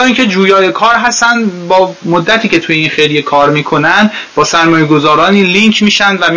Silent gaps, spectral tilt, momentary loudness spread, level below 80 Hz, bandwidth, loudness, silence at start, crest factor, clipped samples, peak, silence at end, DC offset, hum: none; -4 dB/octave; 4 LU; -46 dBFS; 8 kHz; -8 LUFS; 0 s; 8 dB; 1%; 0 dBFS; 0 s; 0.4%; none